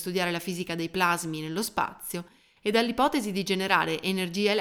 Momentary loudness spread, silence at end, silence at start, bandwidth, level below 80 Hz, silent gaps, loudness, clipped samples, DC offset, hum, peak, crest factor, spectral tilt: 8 LU; 0 s; 0 s; 19.5 kHz; -62 dBFS; none; -27 LUFS; under 0.1%; under 0.1%; none; -6 dBFS; 22 dB; -4 dB/octave